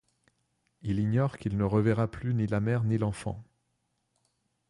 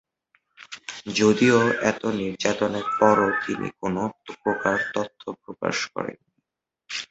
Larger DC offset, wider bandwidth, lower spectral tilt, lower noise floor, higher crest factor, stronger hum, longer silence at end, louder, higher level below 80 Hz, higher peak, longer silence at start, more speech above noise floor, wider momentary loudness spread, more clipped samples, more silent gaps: neither; first, 11.5 kHz vs 8.2 kHz; first, -8.5 dB/octave vs -4.5 dB/octave; second, -77 dBFS vs -83 dBFS; second, 16 dB vs 22 dB; neither; first, 1.25 s vs 0.05 s; second, -29 LUFS vs -23 LUFS; first, -52 dBFS vs -60 dBFS; second, -14 dBFS vs -4 dBFS; first, 0.85 s vs 0.6 s; second, 49 dB vs 60 dB; second, 12 LU vs 17 LU; neither; neither